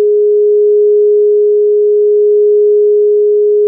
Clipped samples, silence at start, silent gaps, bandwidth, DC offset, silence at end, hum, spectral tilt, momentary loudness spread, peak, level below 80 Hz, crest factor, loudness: under 0.1%; 0 s; none; 0.6 kHz; under 0.1%; 0 s; none; -1 dB/octave; 1 LU; -4 dBFS; under -90 dBFS; 4 dB; -9 LUFS